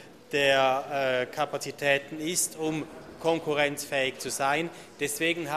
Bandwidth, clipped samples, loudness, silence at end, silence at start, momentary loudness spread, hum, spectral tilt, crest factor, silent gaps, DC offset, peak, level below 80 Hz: 15 kHz; under 0.1%; -28 LUFS; 0 s; 0 s; 8 LU; none; -2.5 dB/octave; 18 dB; none; under 0.1%; -10 dBFS; -66 dBFS